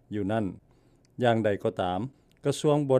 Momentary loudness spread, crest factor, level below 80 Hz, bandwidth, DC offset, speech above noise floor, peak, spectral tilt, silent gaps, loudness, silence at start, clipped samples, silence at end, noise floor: 11 LU; 18 dB; -64 dBFS; 14 kHz; under 0.1%; 35 dB; -10 dBFS; -6.5 dB/octave; none; -28 LUFS; 0.1 s; under 0.1%; 0 s; -61 dBFS